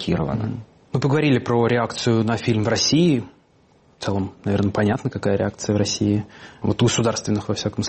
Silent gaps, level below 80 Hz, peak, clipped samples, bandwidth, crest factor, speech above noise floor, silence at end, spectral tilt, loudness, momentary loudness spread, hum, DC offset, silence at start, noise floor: none; -48 dBFS; -6 dBFS; under 0.1%; 8.8 kHz; 14 dB; 36 dB; 0 s; -5.5 dB/octave; -21 LUFS; 9 LU; none; under 0.1%; 0 s; -56 dBFS